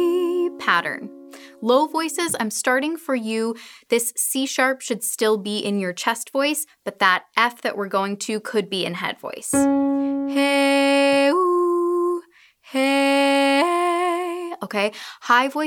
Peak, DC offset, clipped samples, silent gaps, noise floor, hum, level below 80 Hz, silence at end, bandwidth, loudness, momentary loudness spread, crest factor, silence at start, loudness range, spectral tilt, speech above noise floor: 0 dBFS; under 0.1%; under 0.1%; none; -51 dBFS; none; -68 dBFS; 0 s; 19 kHz; -21 LUFS; 10 LU; 22 dB; 0 s; 3 LU; -3 dB/octave; 30 dB